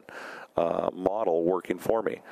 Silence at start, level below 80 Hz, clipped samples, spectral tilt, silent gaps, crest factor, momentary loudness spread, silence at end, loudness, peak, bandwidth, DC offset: 0.1 s; -62 dBFS; under 0.1%; -6.5 dB/octave; none; 20 dB; 8 LU; 0 s; -28 LUFS; -8 dBFS; 15.5 kHz; under 0.1%